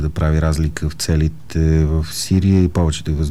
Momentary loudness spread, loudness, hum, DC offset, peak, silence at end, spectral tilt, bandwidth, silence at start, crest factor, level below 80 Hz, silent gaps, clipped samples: 6 LU; -18 LUFS; none; 2%; -4 dBFS; 0 s; -6 dB/octave; 14 kHz; 0 s; 12 dB; -24 dBFS; none; under 0.1%